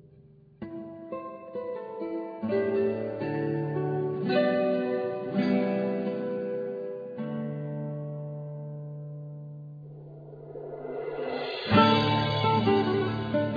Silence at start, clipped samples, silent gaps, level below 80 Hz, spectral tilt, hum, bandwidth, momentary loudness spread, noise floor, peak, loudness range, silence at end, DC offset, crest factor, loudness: 0.2 s; under 0.1%; none; -62 dBFS; -8.5 dB/octave; none; 5 kHz; 17 LU; -55 dBFS; -8 dBFS; 12 LU; 0 s; under 0.1%; 22 dB; -29 LUFS